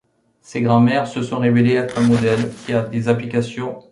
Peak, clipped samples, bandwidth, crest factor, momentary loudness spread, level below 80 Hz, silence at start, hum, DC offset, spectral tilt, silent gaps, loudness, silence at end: -2 dBFS; under 0.1%; 11 kHz; 16 dB; 8 LU; -52 dBFS; 0.5 s; none; under 0.1%; -7 dB/octave; none; -18 LUFS; 0.1 s